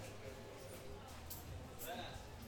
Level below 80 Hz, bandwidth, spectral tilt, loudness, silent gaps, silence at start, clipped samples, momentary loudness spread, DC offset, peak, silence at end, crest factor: -60 dBFS; over 20 kHz; -4 dB/octave; -51 LUFS; none; 0 s; under 0.1%; 6 LU; under 0.1%; -34 dBFS; 0 s; 18 dB